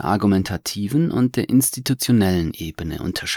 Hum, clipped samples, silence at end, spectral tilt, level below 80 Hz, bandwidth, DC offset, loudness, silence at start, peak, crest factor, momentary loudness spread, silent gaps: none; under 0.1%; 0 s; -5 dB/octave; -46 dBFS; over 20 kHz; under 0.1%; -20 LUFS; 0 s; -6 dBFS; 14 dB; 10 LU; none